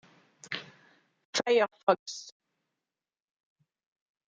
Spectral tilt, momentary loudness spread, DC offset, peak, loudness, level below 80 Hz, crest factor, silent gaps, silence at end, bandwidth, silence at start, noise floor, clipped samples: -2.5 dB/octave; 16 LU; under 0.1%; -8 dBFS; -30 LUFS; -86 dBFS; 26 dB; 1.25-1.33 s, 1.83-1.87 s, 1.99-2.06 s; 1.95 s; 9.4 kHz; 0.5 s; under -90 dBFS; under 0.1%